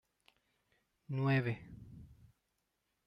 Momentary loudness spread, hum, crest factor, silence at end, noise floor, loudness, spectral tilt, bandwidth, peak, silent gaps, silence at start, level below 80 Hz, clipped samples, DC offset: 23 LU; none; 18 dB; 0.95 s; -84 dBFS; -36 LUFS; -9 dB/octave; 5.8 kHz; -22 dBFS; none; 1.1 s; -70 dBFS; under 0.1%; under 0.1%